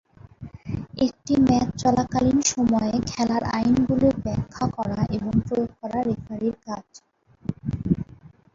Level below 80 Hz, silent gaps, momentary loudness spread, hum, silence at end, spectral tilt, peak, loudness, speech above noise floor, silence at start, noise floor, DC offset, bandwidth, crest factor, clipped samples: -44 dBFS; none; 14 LU; none; 0.25 s; -6 dB/octave; -6 dBFS; -24 LUFS; 26 dB; 0.4 s; -49 dBFS; under 0.1%; 7.8 kHz; 18 dB; under 0.1%